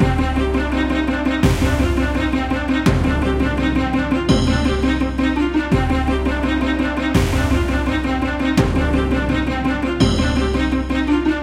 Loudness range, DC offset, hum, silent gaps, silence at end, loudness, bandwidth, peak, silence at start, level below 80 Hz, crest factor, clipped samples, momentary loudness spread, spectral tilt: 1 LU; under 0.1%; none; none; 0 s; -18 LUFS; 15 kHz; -2 dBFS; 0 s; -24 dBFS; 16 dB; under 0.1%; 3 LU; -6.5 dB/octave